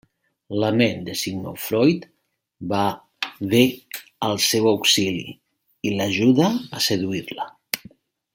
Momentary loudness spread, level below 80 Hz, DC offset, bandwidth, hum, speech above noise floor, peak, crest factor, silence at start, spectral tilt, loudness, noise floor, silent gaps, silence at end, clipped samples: 13 LU; -62 dBFS; under 0.1%; 17 kHz; none; 30 dB; 0 dBFS; 22 dB; 0.5 s; -4 dB/octave; -21 LUFS; -51 dBFS; none; 0.55 s; under 0.1%